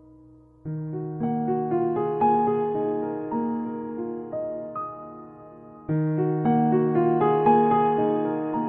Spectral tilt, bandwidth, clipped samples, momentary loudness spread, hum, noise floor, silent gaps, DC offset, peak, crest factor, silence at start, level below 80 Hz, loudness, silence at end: -12 dB/octave; 3.6 kHz; under 0.1%; 14 LU; none; -52 dBFS; none; under 0.1%; -8 dBFS; 18 dB; 0.65 s; -62 dBFS; -24 LUFS; 0 s